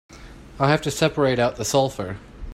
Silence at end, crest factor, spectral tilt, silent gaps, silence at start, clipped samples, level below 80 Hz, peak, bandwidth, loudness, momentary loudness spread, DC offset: 0 s; 20 dB; -5 dB/octave; none; 0.1 s; under 0.1%; -44 dBFS; -4 dBFS; 16 kHz; -21 LUFS; 12 LU; under 0.1%